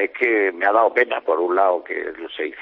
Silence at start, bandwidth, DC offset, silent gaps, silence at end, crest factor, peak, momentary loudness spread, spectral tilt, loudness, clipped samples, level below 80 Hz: 0 s; 5.4 kHz; under 0.1%; none; 0 s; 16 dB; -4 dBFS; 11 LU; -5 dB/octave; -19 LUFS; under 0.1%; -66 dBFS